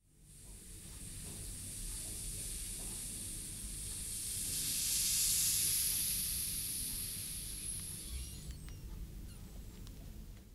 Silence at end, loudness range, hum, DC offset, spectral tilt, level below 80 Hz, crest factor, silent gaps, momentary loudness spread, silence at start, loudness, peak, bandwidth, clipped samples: 0 s; 11 LU; 50 Hz at -60 dBFS; under 0.1%; -1 dB/octave; -52 dBFS; 20 dB; none; 22 LU; 0.15 s; -36 LUFS; -20 dBFS; 16 kHz; under 0.1%